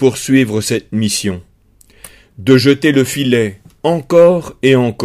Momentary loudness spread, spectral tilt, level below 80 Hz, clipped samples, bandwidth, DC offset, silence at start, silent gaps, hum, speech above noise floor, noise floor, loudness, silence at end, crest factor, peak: 11 LU; -5.5 dB/octave; -48 dBFS; 0.1%; 16 kHz; under 0.1%; 0 s; none; none; 36 dB; -48 dBFS; -13 LUFS; 0 s; 14 dB; 0 dBFS